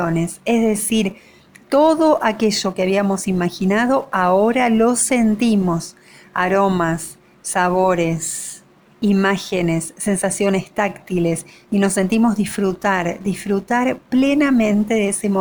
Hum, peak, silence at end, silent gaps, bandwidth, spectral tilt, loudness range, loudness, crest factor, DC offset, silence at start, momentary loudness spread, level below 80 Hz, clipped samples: none; -4 dBFS; 0 s; none; over 20 kHz; -5 dB/octave; 3 LU; -18 LUFS; 14 dB; under 0.1%; 0 s; 8 LU; -48 dBFS; under 0.1%